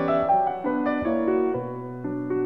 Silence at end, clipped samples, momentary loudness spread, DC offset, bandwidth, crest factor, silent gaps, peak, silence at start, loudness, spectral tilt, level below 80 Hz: 0 s; under 0.1%; 10 LU; 0.2%; 5.6 kHz; 12 dB; none; -12 dBFS; 0 s; -25 LUFS; -9.5 dB/octave; -56 dBFS